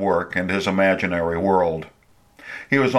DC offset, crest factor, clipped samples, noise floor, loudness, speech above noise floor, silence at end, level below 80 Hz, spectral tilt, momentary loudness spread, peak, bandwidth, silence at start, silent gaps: under 0.1%; 18 dB; under 0.1%; -50 dBFS; -21 LUFS; 30 dB; 0 s; -50 dBFS; -6.5 dB/octave; 16 LU; -4 dBFS; 13.5 kHz; 0 s; none